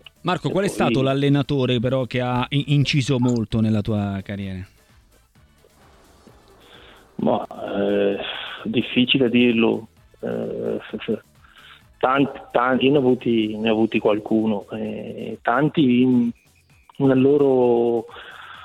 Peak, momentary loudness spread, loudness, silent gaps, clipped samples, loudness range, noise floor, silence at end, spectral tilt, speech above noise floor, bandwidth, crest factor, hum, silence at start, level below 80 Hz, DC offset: -4 dBFS; 12 LU; -21 LUFS; none; under 0.1%; 8 LU; -55 dBFS; 0 s; -7 dB/octave; 35 dB; 12.5 kHz; 18 dB; none; 0.25 s; -52 dBFS; under 0.1%